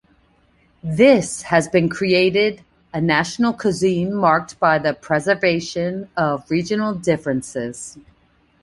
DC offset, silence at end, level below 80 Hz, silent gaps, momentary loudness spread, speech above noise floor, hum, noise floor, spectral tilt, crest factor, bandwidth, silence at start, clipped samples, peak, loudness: under 0.1%; 0.65 s; -52 dBFS; none; 12 LU; 39 dB; none; -58 dBFS; -5 dB/octave; 18 dB; 11.5 kHz; 0.85 s; under 0.1%; -2 dBFS; -19 LUFS